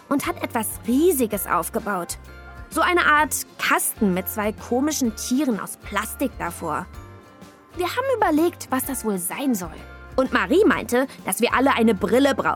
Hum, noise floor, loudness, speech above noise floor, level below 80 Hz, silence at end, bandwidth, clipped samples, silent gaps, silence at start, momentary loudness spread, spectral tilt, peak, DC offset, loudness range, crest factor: none; -46 dBFS; -22 LUFS; 24 dB; -46 dBFS; 0 s; 19.5 kHz; under 0.1%; none; 0.1 s; 11 LU; -4 dB/octave; -6 dBFS; under 0.1%; 5 LU; 16 dB